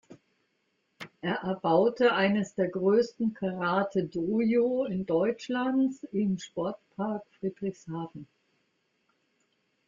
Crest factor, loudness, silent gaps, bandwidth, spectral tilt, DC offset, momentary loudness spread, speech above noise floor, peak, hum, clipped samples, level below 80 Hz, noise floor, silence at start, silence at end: 18 dB; -29 LUFS; none; 7.6 kHz; -7 dB/octave; under 0.1%; 12 LU; 47 dB; -12 dBFS; none; under 0.1%; -70 dBFS; -76 dBFS; 0.1 s; 1.65 s